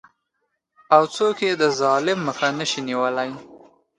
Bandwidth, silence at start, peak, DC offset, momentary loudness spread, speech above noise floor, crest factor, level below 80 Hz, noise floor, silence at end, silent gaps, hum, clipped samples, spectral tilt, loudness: 11 kHz; 0.9 s; 0 dBFS; under 0.1%; 8 LU; 55 dB; 22 dB; -68 dBFS; -75 dBFS; 0.4 s; none; none; under 0.1%; -4 dB/octave; -21 LUFS